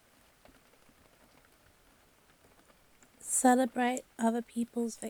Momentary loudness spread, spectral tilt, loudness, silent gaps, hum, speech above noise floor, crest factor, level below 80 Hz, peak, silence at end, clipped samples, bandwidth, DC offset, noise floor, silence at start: 10 LU; -3 dB/octave; -30 LUFS; none; none; 34 dB; 22 dB; -74 dBFS; -14 dBFS; 0 s; under 0.1%; over 20 kHz; under 0.1%; -65 dBFS; 3.25 s